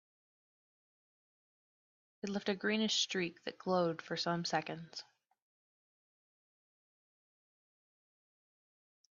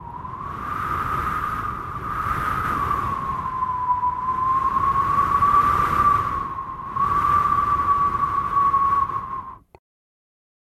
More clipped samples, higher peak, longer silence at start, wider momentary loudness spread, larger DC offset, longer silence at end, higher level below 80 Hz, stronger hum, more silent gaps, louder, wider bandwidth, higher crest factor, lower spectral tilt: neither; second, -20 dBFS vs -8 dBFS; first, 2.25 s vs 0 s; first, 14 LU vs 11 LU; neither; first, 4.15 s vs 1.2 s; second, -84 dBFS vs -40 dBFS; neither; neither; second, -36 LUFS vs -21 LUFS; second, 7.4 kHz vs 14.5 kHz; first, 22 dB vs 14 dB; second, -3 dB/octave vs -6 dB/octave